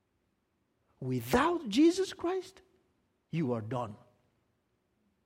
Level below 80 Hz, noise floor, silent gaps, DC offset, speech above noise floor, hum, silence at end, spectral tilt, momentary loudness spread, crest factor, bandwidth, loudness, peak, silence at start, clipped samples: -60 dBFS; -78 dBFS; none; under 0.1%; 47 dB; none; 1.3 s; -5.5 dB/octave; 13 LU; 20 dB; 16 kHz; -31 LUFS; -14 dBFS; 1 s; under 0.1%